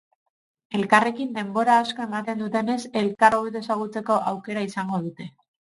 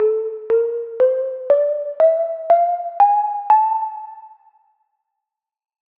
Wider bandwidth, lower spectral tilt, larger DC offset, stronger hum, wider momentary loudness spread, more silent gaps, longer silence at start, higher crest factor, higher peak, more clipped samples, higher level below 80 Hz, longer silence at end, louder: first, 11.5 kHz vs 4.1 kHz; about the same, -5.5 dB/octave vs -6 dB/octave; neither; neither; about the same, 10 LU vs 8 LU; neither; first, 0.7 s vs 0 s; first, 24 dB vs 14 dB; about the same, -2 dBFS vs -4 dBFS; neither; first, -66 dBFS vs -76 dBFS; second, 0.5 s vs 1.7 s; second, -23 LUFS vs -18 LUFS